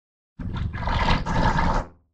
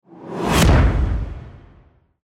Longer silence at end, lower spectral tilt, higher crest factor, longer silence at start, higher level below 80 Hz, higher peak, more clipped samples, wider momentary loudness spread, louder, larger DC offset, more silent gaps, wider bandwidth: second, 0.25 s vs 0.65 s; about the same, -6 dB/octave vs -5.5 dB/octave; about the same, 18 dB vs 14 dB; first, 0.4 s vs 0.15 s; second, -28 dBFS vs -22 dBFS; about the same, -6 dBFS vs -6 dBFS; neither; second, 10 LU vs 18 LU; second, -25 LUFS vs -18 LUFS; neither; neither; second, 8.4 kHz vs 16.5 kHz